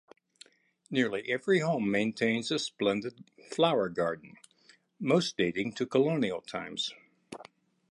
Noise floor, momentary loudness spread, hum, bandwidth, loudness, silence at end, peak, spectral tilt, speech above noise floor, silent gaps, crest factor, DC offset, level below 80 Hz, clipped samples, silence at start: -64 dBFS; 13 LU; none; 11.5 kHz; -30 LUFS; 0.5 s; -12 dBFS; -5 dB/octave; 34 dB; none; 20 dB; under 0.1%; -72 dBFS; under 0.1%; 0.9 s